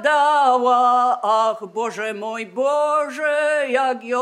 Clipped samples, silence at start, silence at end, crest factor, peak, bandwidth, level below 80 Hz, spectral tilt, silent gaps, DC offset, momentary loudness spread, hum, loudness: under 0.1%; 0 s; 0 s; 14 dB; -4 dBFS; 12 kHz; -88 dBFS; -2.5 dB/octave; none; under 0.1%; 10 LU; none; -19 LUFS